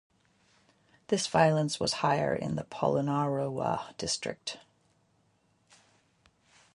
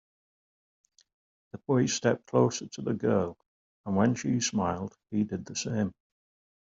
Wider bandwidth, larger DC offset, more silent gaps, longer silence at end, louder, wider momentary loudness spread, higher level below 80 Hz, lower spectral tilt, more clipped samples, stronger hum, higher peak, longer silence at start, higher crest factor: first, 11.5 kHz vs 7.8 kHz; neither; second, none vs 3.46-3.84 s; first, 2.15 s vs 0.8 s; about the same, -30 LUFS vs -29 LUFS; about the same, 11 LU vs 10 LU; about the same, -64 dBFS vs -68 dBFS; about the same, -4.5 dB/octave vs -5 dB/octave; neither; neither; about the same, -10 dBFS vs -10 dBFS; second, 1.1 s vs 1.55 s; about the same, 22 dB vs 20 dB